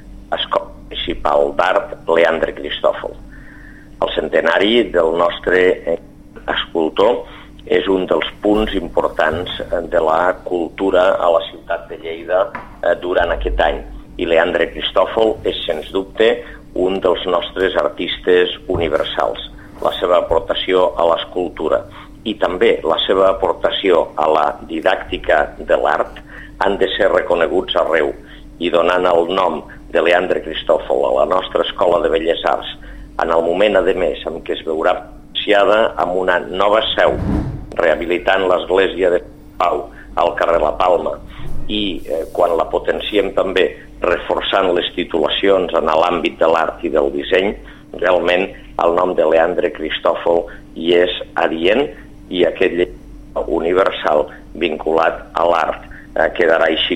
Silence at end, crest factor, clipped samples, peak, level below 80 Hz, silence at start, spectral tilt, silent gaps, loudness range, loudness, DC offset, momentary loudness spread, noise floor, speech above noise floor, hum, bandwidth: 0 s; 16 dB; under 0.1%; 0 dBFS; -36 dBFS; 0 s; -5.5 dB/octave; none; 2 LU; -16 LUFS; 0.3%; 9 LU; -37 dBFS; 21 dB; none; 11.5 kHz